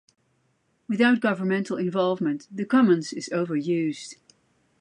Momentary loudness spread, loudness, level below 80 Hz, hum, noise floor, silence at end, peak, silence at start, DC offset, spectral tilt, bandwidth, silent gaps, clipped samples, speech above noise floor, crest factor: 11 LU; -24 LUFS; -76 dBFS; none; -69 dBFS; 0.7 s; -8 dBFS; 0.9 s; under 0.1%; -6 dB/octave; 10.5 kHz; none; under 0.1%; 46 dB; 18 dB